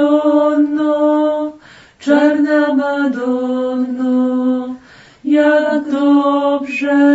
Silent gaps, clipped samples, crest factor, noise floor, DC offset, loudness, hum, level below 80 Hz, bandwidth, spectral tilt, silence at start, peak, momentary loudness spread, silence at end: none; under 0.1%; 14 dB; -41 dBFS; under 0.1%; -14 LUFS; none; -60 dBFS; 8 kHz; -5.5 dB/octave; 0 s; 0 dBFS; 8 LU; 0 s